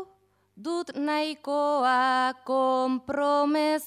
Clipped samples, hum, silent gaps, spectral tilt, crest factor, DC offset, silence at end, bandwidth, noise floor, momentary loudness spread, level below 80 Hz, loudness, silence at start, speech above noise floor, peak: under 0.1%; none; none; -3.5 dB/octave; 14 dB; under 0.1%; 0 s; 15 kHz; -63 dBFS; 9 LU; -72 dBFS; -26 LUFS; 0 s; 38 dB; -12 dBFS